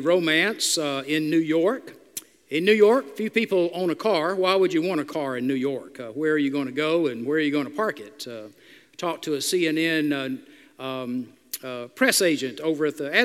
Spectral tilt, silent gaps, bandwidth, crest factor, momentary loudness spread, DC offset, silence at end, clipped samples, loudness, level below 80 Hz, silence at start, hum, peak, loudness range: -3.5 dB/octave; none; 16 kHz; 20 dB; 16 LU; under 0.1%; 0 s; under 0.1%; -23 LUFS; -78 dBFS; 0 s; none; -4 dBFS; 5 LU